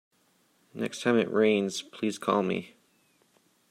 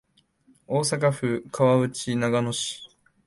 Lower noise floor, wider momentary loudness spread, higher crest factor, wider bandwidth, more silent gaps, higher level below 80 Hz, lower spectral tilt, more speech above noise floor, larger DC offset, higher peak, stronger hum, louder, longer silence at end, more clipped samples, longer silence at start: first, -68 dBFS vs -62 dBFS; first, 11 LU vs 8 LU; about the same, 20 dB vs 18 dB; first, 14 kHz vs 11.5 kHz; neither; second, -76 dBFS vs -62 dBFS; about the same, -5 dB/octave vs -5 dB/octave; about the same, 41 dB vs 38 dB; neither; about the same, -10 dBFS vs -8 dBFS; neither; second, -28 LUFS vs -24 LUFS; first, 1.05 s vs 0.4 s; neither; about the same, 0.75 s vs 0.7 s